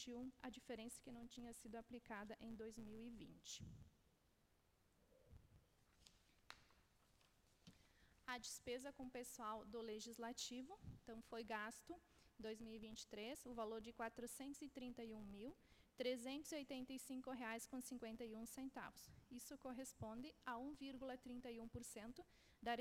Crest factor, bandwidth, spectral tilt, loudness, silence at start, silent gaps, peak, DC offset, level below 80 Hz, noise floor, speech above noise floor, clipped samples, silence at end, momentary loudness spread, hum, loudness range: 22 dB; 16.5 kHz; -3.5 dB/octave; -54 LUFS; 0 s; none; -34 dBFS; under 0.1%; -76 dBFS; -80 dBFS; 26 dB; under 0.1%; 0 s; 9 LU; none; 7 LU